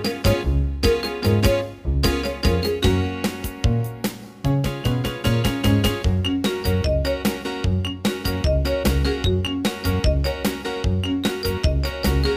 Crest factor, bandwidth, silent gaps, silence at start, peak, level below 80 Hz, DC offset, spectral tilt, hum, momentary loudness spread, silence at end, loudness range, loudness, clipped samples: 16 dB; 16 kHz; none; 0 s; -4 dBFS; -26 dBFS; under 0.1%; -6 dB/octave; none; 5 LU; 0 s; 1 LU; -22 LUFS; under 0.1%